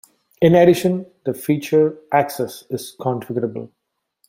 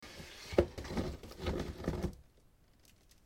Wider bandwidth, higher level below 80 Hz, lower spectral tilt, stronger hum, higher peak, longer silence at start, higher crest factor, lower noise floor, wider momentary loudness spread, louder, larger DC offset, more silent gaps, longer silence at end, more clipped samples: about the same, 16.5 kHz vs 16.5 kHz; second, -58 dBFS vs -48 dBFS; about the same, -6.5 dB/octave vs -6.5 dB/octave; neither; first, -2 dBFS vs -12 dBFS; first, 0.4 s vs 0 s; second, 18 dB vs 28 dB; about the same, -66 dBFS vs -66 dBFS; about the same, 14 LU vs 14 LU; first, -19 LUFS vs -39 LUFS; neither; neither; second, 0.65 s vs 1.05 s; neither